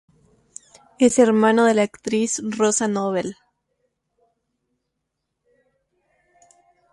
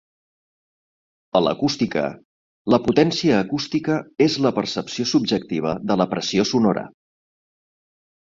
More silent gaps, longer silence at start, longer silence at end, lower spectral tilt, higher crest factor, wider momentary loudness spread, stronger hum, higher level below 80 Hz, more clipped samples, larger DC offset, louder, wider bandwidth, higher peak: second, none vs 2.25-2.65 s; second, 1 s vs 1.35 s; first, 3.6 s vs 1.4 s; second, -4 dB/octave vs -5.5 dB/octave; about the same, 20 dB vs 20 dB; about the same, 9 LU vs 7 LU; neither; second, -66 dBFS vs -56 dBFS; neither; neither; about the same, -19 LUFS vs -21 LUFS; first, 11.5 kHz vs 7.8 kHz; about the same, -4 dBFS vs -2 dBFS